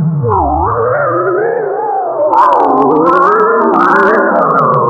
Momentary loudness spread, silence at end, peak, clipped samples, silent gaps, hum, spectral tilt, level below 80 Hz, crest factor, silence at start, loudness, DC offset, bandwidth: 6 LU; 0 s; 0 dBFS; 0.2%; none; none; -9 dB/octave; -32 dBFS; 10 dB; 0 s; -10 LUFS; under 0.1%; 8 kHz